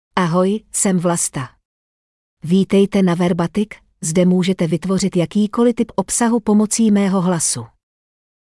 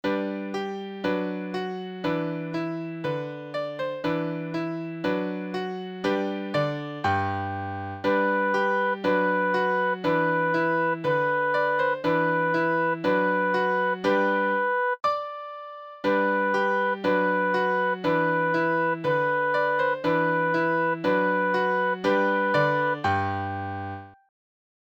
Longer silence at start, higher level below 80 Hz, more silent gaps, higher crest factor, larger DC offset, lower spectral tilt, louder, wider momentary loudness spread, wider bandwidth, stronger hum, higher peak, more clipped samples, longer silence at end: about the same, 0.15 s vs 0.05 s; first, -50 dBFS vs -66 dBFS; first, 1.65-2.37 s vs none; about the same, 14 dB vs 16 dB; neither; second, -5.5 dB/octave vs -7 dB/octave; first, -17 LUFS vs -25 LUFS; about the same, 7 LU vs 8 LU; first, 12 kHz vs 7.8 kHz; neither; first, -2 dBFS vs -10 dBFS; neither; about the same, 0.85 s vs 0.8 s